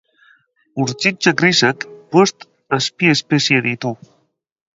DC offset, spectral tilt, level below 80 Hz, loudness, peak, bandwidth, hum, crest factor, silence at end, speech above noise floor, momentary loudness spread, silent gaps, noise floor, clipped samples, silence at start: under 0.1%; -4 dB/octave; -62 dBFS; -16 LUFS; 0 dBFS; 7.8 kHz; none; 18 dB; 0.8 s; 47 dB; 12 LU; none; -64 dBFS; under 0.1%; 0.75 s